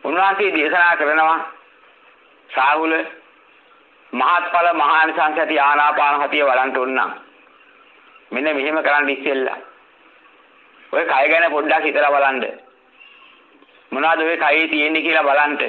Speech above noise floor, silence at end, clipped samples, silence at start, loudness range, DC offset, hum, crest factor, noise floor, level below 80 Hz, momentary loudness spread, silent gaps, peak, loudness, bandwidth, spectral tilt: 34 dB; 0 s; under 0.1%; 0.05 s; 5 LU; under 0.1%; none; 16 dB; -51 dBFS; -78 dBFS; 10 LU; none; -2 dBFS; -17 LUFS; 6 kHz; -5 dB/octave